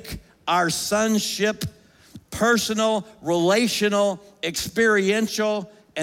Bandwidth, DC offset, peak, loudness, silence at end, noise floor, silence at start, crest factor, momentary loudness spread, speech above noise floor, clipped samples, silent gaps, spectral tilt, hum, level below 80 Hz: 17 kHz; under 0.1%; -6 dBFS; -22 LUFS; 0 s; -47 dBFS; 0 s; 16 dB; 12 LU; 26 dB; under 0.1%; none; -3.5 dB/octave; none; -52 dBFS